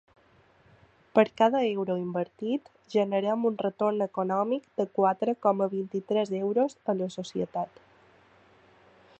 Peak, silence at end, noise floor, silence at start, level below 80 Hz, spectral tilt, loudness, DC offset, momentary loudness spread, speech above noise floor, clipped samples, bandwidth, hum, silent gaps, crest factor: -6 dBFS; 1.55 s; -61 dBFS; 1.15 s; -76 dBFS; -7 dB/octave; -28 LUFS; under 0.1%; 8 LU; 34 dB; under 0.1%; 8.4 kHz; none; none; 22 dB